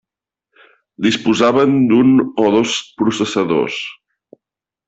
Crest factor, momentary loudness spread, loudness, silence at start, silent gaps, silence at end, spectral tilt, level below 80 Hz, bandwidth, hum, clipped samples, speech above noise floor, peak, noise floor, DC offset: 16 dB; 8 LU; -15 LUFS; 1 s; none; 0.95 s; -5 dB/octave; -56 dBFS; 8 kHz; none; under 0.1%; 71 dB; -2 dBFS; -85 dBFS; under 0.1%